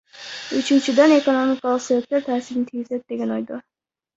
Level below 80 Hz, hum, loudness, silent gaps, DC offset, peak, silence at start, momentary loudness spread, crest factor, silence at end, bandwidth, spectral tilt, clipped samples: -66 dBFS; none; -20 LUFS; none; under 0.1%; -4 dBFS; 0.15 s; 16 LU; 18 dB; 0.55 s; 8 kHz; -4 dB/octave; under 0.1%